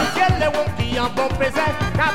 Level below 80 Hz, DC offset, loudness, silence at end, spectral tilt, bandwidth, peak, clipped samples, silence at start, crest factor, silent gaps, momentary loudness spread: -34 dBFS; 3%; -20 LUFS; 0 s; -5 dB/octave; 16.5 kHz; -6 dBFS; under 0.1%; 0 s; 14 dB; none; 4 LU